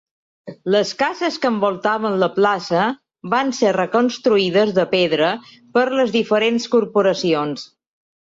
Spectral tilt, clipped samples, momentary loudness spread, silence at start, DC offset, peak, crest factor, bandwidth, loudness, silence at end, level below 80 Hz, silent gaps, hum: -5 dB/octave; under 0.1%; 5 LU; 0.45 s; under 0.1%; -4 dBFS; 14 dB; 7.8 kHz; -18 LUFS; 0.65 s; -64 dBFS; none; none